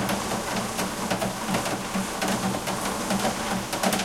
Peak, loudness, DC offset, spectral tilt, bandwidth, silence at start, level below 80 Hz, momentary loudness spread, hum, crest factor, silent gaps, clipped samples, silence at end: -10 dBFS; -27 LUFS; under 0.1%; -3.5 dB/octave; 16.5 kHz; 0 s; -48 dBFS; 3 LU; none; 16 dB; none; under 0.1%; 0 s